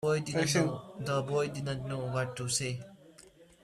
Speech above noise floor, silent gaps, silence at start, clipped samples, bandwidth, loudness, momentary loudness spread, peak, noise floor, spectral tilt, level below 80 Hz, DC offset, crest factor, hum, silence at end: 25 dB; none; 0 s; under 0.1%; 14.5 kHz; -33 LUFS; 9 LU; -16 dBFS; -58 dBFS; -4.5 dB/octave; -62 dBFS; under 0.1%; 18 dB; none; 0.2 s